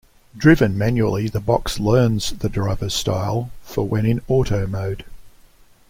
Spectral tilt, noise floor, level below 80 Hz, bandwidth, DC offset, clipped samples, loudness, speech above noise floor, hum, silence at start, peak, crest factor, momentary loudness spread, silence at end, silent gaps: -6 dB/octave; -49 dBFS; -36 dBFS; 16.5 kHz; under 0.1%; under 0.1%; -20 LUFS; 31 dB; none; 0.35 s; -2 dBFS; 18 dB; 10 LU; 0.6 s; none